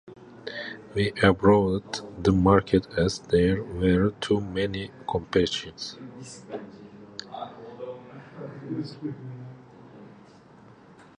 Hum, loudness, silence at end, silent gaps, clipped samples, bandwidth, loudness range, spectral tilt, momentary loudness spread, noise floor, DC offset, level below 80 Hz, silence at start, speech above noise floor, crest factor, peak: none; -25 LUFS; 1.1 s; none; under 0.1%; 11 kHz; 16 LU; -6.5 dB/octave; 21 LU; -51 dBFS; under 0.1%; -46 dBFS; 0.05 s; 27 dB; 22 dB; -4 dBFS